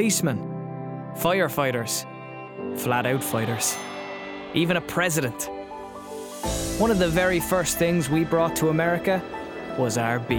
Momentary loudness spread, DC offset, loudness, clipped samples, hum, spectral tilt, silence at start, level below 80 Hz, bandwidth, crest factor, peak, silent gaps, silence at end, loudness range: 13 LU; under 0.1%; -25 LUFS; under 0.1%; none; -4.5 dB/octave; 0 s; -46 dBFS; 19.5 kHz; 16 dB; -10 dBFS; none; 0 s; 4 LU